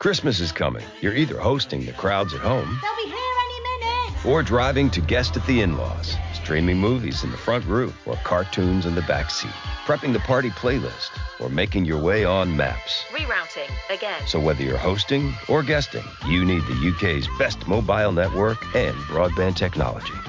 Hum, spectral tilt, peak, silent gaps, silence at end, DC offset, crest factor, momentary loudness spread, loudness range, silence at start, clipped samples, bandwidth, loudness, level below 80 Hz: none; -6 dB/octave; -10 dBFS; none; 0 s; under 0.1%; 12 dB; 7 LU; 2 LU; 0 s; under 0.1%; 7.6 kHz; -23 LUFS; -34 dBFS